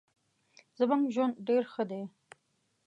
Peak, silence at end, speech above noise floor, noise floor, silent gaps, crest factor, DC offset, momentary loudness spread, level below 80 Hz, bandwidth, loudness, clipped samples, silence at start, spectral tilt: -16 dBFS; 0.8 s; 46 dB; -76 dBFS; none; 18 dB; under 0.1%; 11 LU; -88 dBFS; 9 kHz; -31 LUFS; under 0.1%; 0.8 s; -7 dB/octave